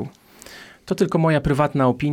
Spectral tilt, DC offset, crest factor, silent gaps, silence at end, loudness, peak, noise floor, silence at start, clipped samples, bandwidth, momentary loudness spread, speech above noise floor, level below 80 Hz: -7.5 dB/octave; under 0.1%; 14 dB; none; 0 s; -20 LUFS; -6 dBFS; -44 dBFS; 0 s; under 0.1%; 15.5 kHz; 22 LU; 26 dB; -42 dBFS